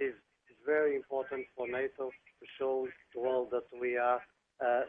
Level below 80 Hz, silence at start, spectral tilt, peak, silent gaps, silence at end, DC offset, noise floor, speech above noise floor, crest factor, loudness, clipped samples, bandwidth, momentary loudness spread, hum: -76 dBFS; 0 s; -7.5 dB/octave; -18 dBFS; none; 0 s; under 0.1%; -65 dBFS; 30 dB; 18 dB; -35 LUFS; under 0.1%; 3.7 kHz; 12 LU; none